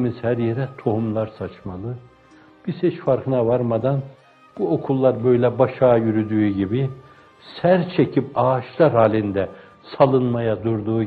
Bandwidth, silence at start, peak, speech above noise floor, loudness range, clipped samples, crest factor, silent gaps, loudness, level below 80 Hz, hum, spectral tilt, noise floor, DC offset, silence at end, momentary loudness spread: 4.7 kHz; 0 s; -2 dBFS; 30 dB; 5 LU; under 0.1%; 18 dB; none; -20 LUFS; -56 dBFS; none; -10.5 dB/octave; -50 dBFS; under 0.1%; 0 s; 14 LU